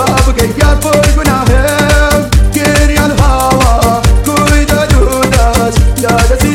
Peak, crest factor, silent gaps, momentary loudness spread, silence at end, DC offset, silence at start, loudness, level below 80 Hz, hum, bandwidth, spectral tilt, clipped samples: 0 dBFS; 8 dB; none; 1 LU; 0 s; under 0.1%; 0 s; -9 LUFS; -12 dBFS; none; 17 kHz; -5 dB/octave; 0.2%